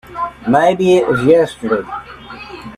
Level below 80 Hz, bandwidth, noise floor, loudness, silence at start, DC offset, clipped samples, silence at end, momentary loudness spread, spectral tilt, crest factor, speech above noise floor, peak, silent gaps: -46 dBFS; 12.5 kHz; -33 dBFS; -14 LUFS; 0.1 s; under 0.1%; under 0.1%; 0 s; 19 LU; -6.5 dB/octave; 14 dB; 20 dB; 0 dBFS; none